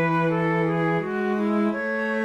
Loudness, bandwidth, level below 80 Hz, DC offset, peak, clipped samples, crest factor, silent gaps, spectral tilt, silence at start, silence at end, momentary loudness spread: -23 LUFS; 8.2 kHz; -62 dBFS; under 0.1%; -12 dBFS; under 0.1%; 10 dB; none; -8.5 dB/octave; 0 s; 0 s; 3 LU